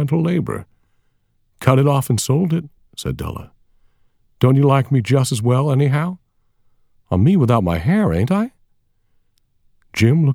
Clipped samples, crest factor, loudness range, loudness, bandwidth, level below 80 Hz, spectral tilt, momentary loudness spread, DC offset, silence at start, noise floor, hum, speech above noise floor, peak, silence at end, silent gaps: under 0.1%; 18 dB; 3 LU; -17 LUFS; 16.5 kHz; -44 dBFS; -7 dB/octave; 13 LU; under 0.1%; 0 s; -62 dBFS; none; 46 dB; 0 dBFS; 0 s; none